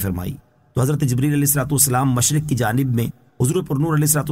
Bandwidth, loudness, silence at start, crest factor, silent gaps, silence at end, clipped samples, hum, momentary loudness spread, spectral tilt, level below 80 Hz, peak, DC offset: 16.5 kHz; -19 LUFS; 0 s; 16 dB; none; 0 s; under 0.1%; none; 12 LU; -5 dB/octave; -44 dBFS; -2 dBFS; under 0.1%